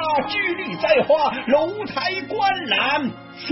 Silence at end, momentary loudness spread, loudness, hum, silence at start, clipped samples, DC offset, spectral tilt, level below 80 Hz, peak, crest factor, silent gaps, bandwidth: 0 s; 6 LU; -20 LUFS; none; 0 s; under 0.1%; under 0.1%; -7 dB/octave; -58 dBFS; -4 dBFS; 16 dB; none; 6 kHz